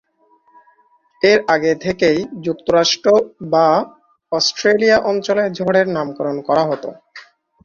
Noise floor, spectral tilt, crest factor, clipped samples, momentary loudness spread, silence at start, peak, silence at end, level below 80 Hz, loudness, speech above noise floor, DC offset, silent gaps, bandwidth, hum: -56 dBFS; -4 dB/octave; 16 dB; under 0.1%; 9 LU; 1.25 s; -2 dBFS; 0.45 s; -56 dBFS; -16 LUFS; 41 dB; under 0.1%; none; 7.4 kHz; none